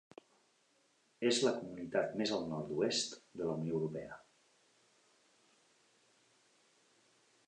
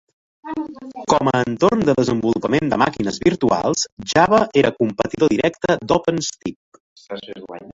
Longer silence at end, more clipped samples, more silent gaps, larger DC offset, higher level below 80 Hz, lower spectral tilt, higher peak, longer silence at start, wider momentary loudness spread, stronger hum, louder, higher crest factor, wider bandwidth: first, 3.3 s vs 0 s; neither; second, none vs 3.92-3.97 s, 6.56-6.72 s, 6.80-6.96 s; neither; second, -76 dBFS vs -48 dBFS; about the same, -4 dB/octave vs -5 dB/octave; second, -20 dBFS vs -2 dBFS; first, 1.2 s vs 0.45 s; second, 10 LU vs 16 LU; neither; second, -37 LUFS vs -18 LUFS; about the same, 22 dB vs 18 dB; first, 10.5 kHz vs 7.8 kHz